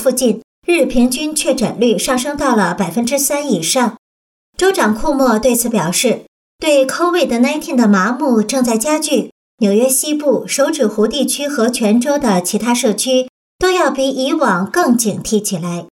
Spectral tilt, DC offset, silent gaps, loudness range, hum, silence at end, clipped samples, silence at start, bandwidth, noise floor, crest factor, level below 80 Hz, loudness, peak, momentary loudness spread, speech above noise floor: -4 dB/octave; under 0.1%; 0.44-0.62 s, 3.98-4.53 s, 6.28-6.59 s, 9.32-9.58 s, 13.29-13.59 s; 1 LU; none; 0.1 s; under 0.1%; 0 s; 17.5 kHz; under -90 dBFS; 12 dB; -42 dBFS; -14 LUFS; -2 dBFS; 4 LU; over 76 dB